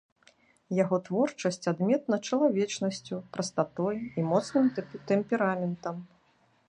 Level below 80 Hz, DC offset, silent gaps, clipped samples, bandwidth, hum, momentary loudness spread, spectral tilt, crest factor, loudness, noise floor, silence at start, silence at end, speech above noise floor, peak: -72 dBFS; under 0.1%; none; under 0.1%; 10.5 kHz; none; 9 LU; -6 dB/octave; 18 dB; -29 LUFS; -67 dBFS; 0.7 s; 0.6 s; 38 dB; -12 dBFS